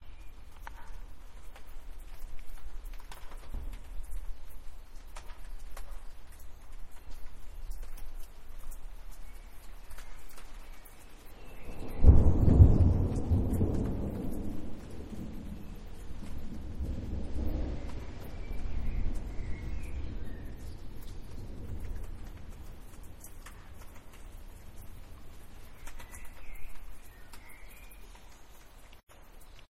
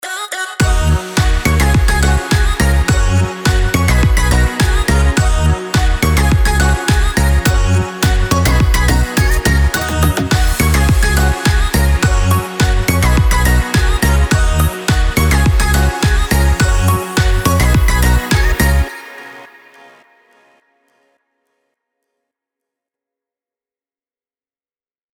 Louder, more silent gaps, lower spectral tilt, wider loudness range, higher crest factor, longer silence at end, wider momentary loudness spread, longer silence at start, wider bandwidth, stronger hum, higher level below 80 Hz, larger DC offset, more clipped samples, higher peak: second, -32 LUFS vs -13 LUFS; first, 29.03-29.07 s vs none; first, -8 dB/octave vs -5 dB/octave; first, 24 LU vs 2 LU; first, 26 dB vs 10 dB; second, 0.05 s vs 5.7 s; first, 23 LU vs 3 LU; about the same, 0 s vs 0.05 s; second, 14.5 kHz vs over 20 kHz; neither; second, -36 dBFS vs -16 dBFS; neither; neither; second, -6 dBFS vs -2 dBFS